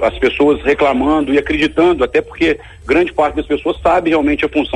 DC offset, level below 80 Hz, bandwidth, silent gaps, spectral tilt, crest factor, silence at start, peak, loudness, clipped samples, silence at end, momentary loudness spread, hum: under 0.1%; -34 dBFS; 10 kHz; none; -6 dB/octave; 12 dB; 0 s; -2 dBFS; -14 LUFS; under 0.1%; 0 s; 4 LU; none